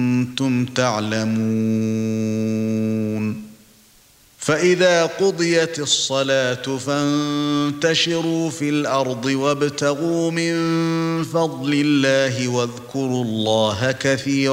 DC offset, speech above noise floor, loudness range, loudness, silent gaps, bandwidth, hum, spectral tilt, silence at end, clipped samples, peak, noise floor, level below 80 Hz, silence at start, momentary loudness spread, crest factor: under 0.1%; 33 dB; 3 LU; -20 LUFS; none; 16 kHz; none; -4.5 dB/octave; 0 s; under 0.1%; -4 dBFS; -52 dBFS; -60 dBFS; 0 s; 5 LU; 16 dB